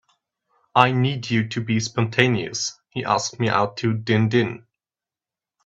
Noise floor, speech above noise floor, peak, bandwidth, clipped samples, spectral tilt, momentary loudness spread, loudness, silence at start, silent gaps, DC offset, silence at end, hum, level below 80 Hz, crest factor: under -90 dBFS; over 69 dB; 0 dBFS; 7.8 kHz; under 0.1%; -5 dB/octave; 8 LU; -21 LUFS; 0.75 s; none; under 0.1%; 1.1 s; none; -58 dBFS; 22 dB